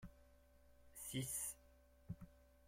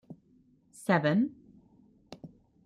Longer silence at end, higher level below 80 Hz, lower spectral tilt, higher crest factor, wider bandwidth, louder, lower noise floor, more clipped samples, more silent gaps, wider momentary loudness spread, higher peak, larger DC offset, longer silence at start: second, 0 s vs 0.4 s; about the same, -68 dBFS vs -72 dBFS; second, -3.5 dB/octave vs -7 dB/octave; about the same, 20 dB vs 22 dB; first, 16.5 kHz vs 13.5 kHz; second, -48 LUFS vs -29 LUFS; first, -69 dBFS vs -65 dBFS; neither; neither; second, 19 LU vs 26 LU; second, -32 dBFS vs -12 dBFS; neither; about the same, 0 s vs 0.1 s